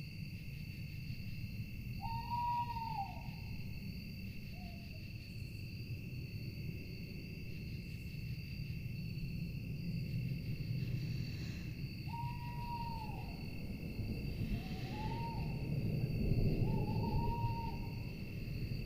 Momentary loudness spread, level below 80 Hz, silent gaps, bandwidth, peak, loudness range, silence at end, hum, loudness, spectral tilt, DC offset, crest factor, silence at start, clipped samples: 10 LU; -48 dBFS; none; 15.5 kHz; -22 dBFS; 8 LU; 0 s; none; -43 LUFS; -7.5 dB/octave; under 0.1%; 18 dB; 0 s; under 0.1%